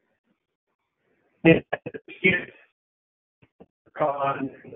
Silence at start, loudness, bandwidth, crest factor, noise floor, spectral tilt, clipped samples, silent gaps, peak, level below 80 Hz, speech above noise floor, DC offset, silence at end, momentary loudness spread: 1.45 s; -23 LUFS; 3.9 kHz; 24 dB; -71 dBFS; -2.5 dB/octave; under 0.1%; 2.72-3.42 s, 3.52-3.59 s, 3.70-3.85 s; -4 dBFS; -60 dBFS; 47 dB; under 0.1%; 0 s; 19 LU